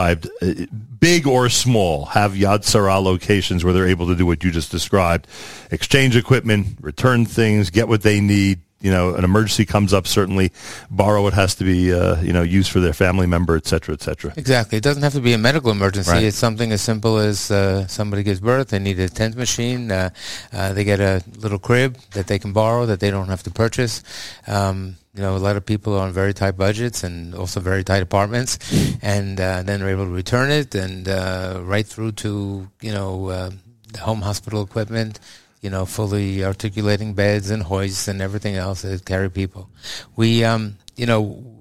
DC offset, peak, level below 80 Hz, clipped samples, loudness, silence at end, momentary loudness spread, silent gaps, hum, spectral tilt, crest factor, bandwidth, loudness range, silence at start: 0.8%; 0 dBFS; -38 dBFS; under 0.1%; -19 LUFS; 0 s; 11 LU; none; none; -5.5 dB/octave; 18 dB; 16 kHz; 6 LU; 0 s